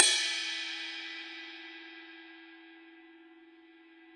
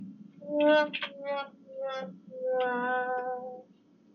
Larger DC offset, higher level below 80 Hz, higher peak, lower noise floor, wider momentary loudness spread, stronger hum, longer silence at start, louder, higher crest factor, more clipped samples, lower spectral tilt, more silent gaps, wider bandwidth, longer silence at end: neither; about the same, under -90 dBFS vs under -90 dBFS; first, -4 dBFS vs -14 dBFS; about the same, -58 dBFS vs -61 dBFS; first, 25 LU vs 19 LU; neither; about the same, 0 s vs 0 s; about the same, -33 LUFS vs -31 LUFS; first, 32 dB vs 18 dB; neither; second, 4 dB/octave vs -1.5 dB/octave; neither; first, 11.5 kHz vs 6.8 kHz; second, 0 s vs 0.55 s